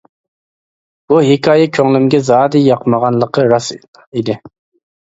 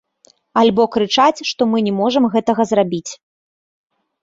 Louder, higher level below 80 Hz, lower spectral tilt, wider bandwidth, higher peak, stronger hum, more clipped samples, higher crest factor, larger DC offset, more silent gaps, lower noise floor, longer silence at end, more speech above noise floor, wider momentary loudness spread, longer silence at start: first, -12 LUFS vs -16 LUFS; about the same, -54 dBFS vs -58 dBFS; first, -6.5 dB/octave vs -5 dB/octave; about the same, 8 kHz vs 7.8 kHz; about the same, 0 dBFS vs -2 dBFS; neither; neither; about the same, 14 dB vs 16 dB; neither; first, 3.88-3.93 s, 4.07-4.12 s vs none; first, under -90 dBFS vs -55 dBFS; second, 0.7 s vs 1.1 s; first, over 79 dB vs 40 dB; first, 11 LU vs 7 LU; first, 1.1 s vs 0.55 s